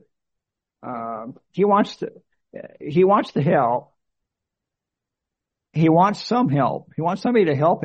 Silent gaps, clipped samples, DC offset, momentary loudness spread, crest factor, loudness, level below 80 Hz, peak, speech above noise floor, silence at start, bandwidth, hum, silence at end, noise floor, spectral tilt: none; under 0.1%; under 0.1%; 17 LU; 18 dB; -20 LUFS; -64 dBFS; -4 dBFS; 65 dB; 0.85 s; 8.4 kHz; none; 0 s; -85 dBFS; -8 dB/octave